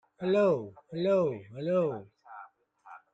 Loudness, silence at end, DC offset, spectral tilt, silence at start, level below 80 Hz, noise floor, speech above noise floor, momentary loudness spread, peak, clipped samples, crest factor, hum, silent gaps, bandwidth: -29 LUFS; 0.15 s; under 0.1%; -8 dB/octave; 0.2 s; -74 dBFS; -55 dBFS; 26 dB; 23 LU; -14 dBFS; under 0.1%; 16 dB; none; none; 7.8 kHz